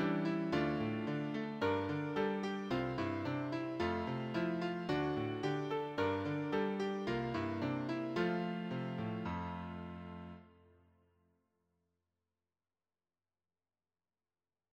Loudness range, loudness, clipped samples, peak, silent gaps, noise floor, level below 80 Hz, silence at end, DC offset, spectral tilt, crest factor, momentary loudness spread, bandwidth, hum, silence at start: 10 LU; -38 LUFS; under 0.1%; -22 dBFS; none; under -90 dBFS; -66 dBFS; 4.25 s; under 0.1%; -7.5 dB/octave; 18 dB; 6 LU; 8.8 kHz; none; 0 s